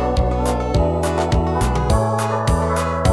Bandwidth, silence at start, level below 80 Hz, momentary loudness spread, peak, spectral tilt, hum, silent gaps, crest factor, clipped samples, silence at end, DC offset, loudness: 11 kHz; 0 s; -24 dBFS; 1 LU; -4 dBFS; -6.5 dB/octave; none; none; 14 dB; under 0.1%; 0 s; under 0.1%; -19 LUFS